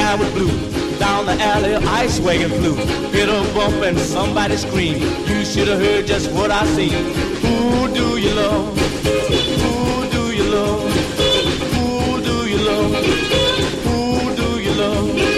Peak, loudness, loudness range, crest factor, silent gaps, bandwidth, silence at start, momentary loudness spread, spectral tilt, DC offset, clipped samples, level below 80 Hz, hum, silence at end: -4 dBFS; -17 LUFS; 1 LU; 12 dB; none; 15 kHz; 0 s; 3 LU; -5 dB/octave; under 0.1%; under 0.1%; -30 dBFS; none; 0 s